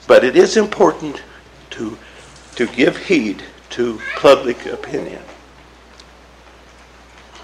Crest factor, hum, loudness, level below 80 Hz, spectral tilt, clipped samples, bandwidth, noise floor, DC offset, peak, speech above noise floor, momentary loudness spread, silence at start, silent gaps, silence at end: 18 dB; none; -16 LUFS; -48 dBFS; -4.5 dB/octave; under 0.1%; 12.5 kHz; -43 dBFS; under 0.1%; 0 dBFS; 28 dB; 20 LU; 0.1 s; none; 2.1 s